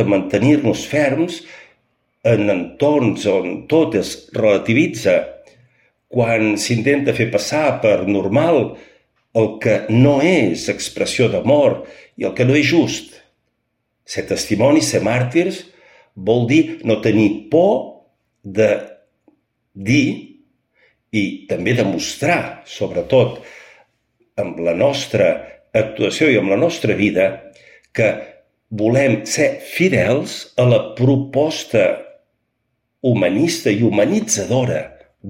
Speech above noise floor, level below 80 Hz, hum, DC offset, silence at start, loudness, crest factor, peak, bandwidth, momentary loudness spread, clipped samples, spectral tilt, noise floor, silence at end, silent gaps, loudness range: 55 dB; -54 dBFS; none; under 0.1%; 0 s; -17 LUFS; 16 dB; -2 dBFS; 16.5 kHz; 10 LU; under 0.1%; -5.5 dB/octave; -71 dBFS; 0 s; none; 4 LU